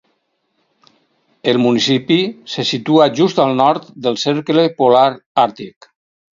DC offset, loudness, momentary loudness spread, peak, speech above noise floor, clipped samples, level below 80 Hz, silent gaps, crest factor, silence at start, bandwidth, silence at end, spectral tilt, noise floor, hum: under 0.1%; -15 LUFS; 9 LU; 0 dBFS; 52 dB; under 0.1%; -64 dBFS; 5.26-5.35 s; 16 dB; 1.45 s; 7.6 kHz; 0.65 s; -5.5 dB/octave; -66 dBFS; none